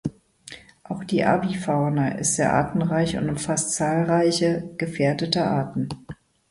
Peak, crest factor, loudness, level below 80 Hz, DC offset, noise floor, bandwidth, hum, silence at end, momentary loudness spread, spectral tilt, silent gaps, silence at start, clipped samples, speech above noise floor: -6 dBFS; 16 dB; -23 LUFS; -52 dBFS; under 0.1%; -45 dBFS; 11.5 kHz; none; 0.35 s; 17 LU; -5 dB/octave; none; 0.05 s; under 0.1%; 23 dB